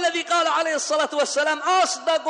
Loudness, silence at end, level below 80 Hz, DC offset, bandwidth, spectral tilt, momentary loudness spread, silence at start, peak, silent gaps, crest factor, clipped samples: -21 LUFS; 0 s; -78 dBFS; under 0.1%; 10.5 kHz; 0.5 dB/octave; 2 LU; 0 s; -8 dBFS; none; 14 dB; under 0.1%